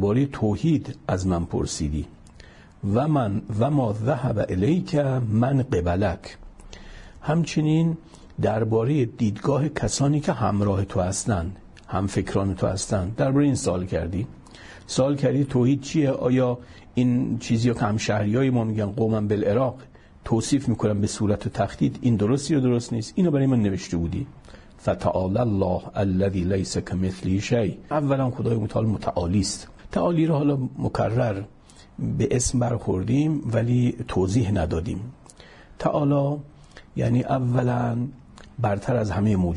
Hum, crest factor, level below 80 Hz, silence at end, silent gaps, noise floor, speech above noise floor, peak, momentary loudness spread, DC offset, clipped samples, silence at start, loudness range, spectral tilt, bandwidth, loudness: none; 14 dB; -46 dBFS; 0 s; none; -47 dBFS; 25 dB; -8 dBFS; 8 LU; under 0.1%; under 0.1%; 0 s; 2 LU; -6.5 dB/octave; 11 kHz; -24 LUFS